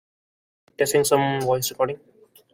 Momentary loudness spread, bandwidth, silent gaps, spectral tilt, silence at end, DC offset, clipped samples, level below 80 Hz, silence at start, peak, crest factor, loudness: 8 LU; 16.5 kHz; none; -4 dB/octave; 0.6 s; under 0.1%; under 0.1%; -60 dBFS; 0.8 s; -4 dBFS; 20 dB; -22 LUFS